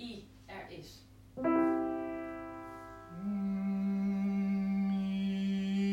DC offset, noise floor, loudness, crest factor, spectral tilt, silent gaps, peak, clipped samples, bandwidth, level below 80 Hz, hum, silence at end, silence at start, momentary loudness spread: under 0.1%; -55 dBFS; -34 LUFS; 16 dB; -8 dB/octave; none; -20 dBFS; under 0.1%; 8 kHz; -64 dBFS; none; 0 s; 0 s; 17 LU